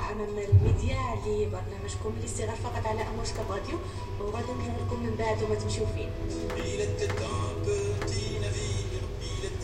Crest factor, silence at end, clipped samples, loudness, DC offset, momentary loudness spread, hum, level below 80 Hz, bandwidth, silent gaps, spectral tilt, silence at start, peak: 20 dB; 0 s; under 0.1%; -31 LUFS; under 0.1%; 7 LU; none; -38 dBFS; 11 kHz; none; -5.5 dB/octave; 0 s; -10 dBFS